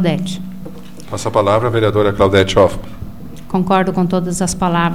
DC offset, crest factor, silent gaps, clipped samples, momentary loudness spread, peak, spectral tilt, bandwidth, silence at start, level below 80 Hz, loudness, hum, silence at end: 3%; 16 dB; none; under 0.1%; 20 LU; 0 dBFS; -5.5 dB/octave; 16 kHz; 0 s; -36 dBFS; -15 LUFS; none; 0 s